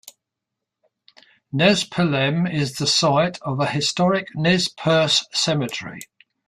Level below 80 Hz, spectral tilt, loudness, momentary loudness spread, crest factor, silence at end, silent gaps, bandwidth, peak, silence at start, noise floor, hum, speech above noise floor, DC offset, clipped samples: -58 dBFS; -4 dB/octave; -20 LUFS; 8 LU; 18 dB; 0.45 s; none; 14 kHz; -2 dBFS; 0.05 s; -83 dBFS; none; 63 dB; under 0.1%; under 0.1%